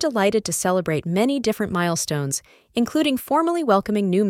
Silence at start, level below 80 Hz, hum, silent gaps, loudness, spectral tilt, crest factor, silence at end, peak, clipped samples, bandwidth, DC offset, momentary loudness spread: 0 s; -56 dBFS; none; none; -21 LUFS; -4.5 dB/octave; 18 dB; 0 s; -4 dBFS; under 0.1%; 17 kHz; under 0.1%; 5 LU